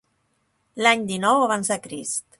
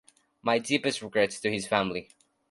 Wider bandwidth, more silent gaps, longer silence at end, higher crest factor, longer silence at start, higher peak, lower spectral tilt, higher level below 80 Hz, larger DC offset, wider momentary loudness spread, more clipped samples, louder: about the same, 12 kHz vs 11.5 kHz; neither; second, 0.2 s vs 0.45 s; about the same, 22 dB vs 22 dB; first, 0.75 s vs 0.45 s; first, -2 dBFS vs -8 dBFS; second, -2.5 dB/octave vs -4 dB/octave; about the same, -66 dBFS vs -64 dBFS; neither; about the same, 9 LU vs 7 LU; neither; first, -21 LUFS vs -28 LUFS